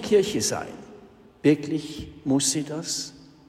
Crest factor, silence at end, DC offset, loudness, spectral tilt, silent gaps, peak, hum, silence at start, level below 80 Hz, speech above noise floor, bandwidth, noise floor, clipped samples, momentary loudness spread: 20 dB; 0.25 s; under 0.1%; -25 LUFS; -4 dB/octave; none; -6 dBFS; none; 0 s; -56 dBFS; 25 dB; 16 kHz; -50 dBFS; under 0.1%; 15 LU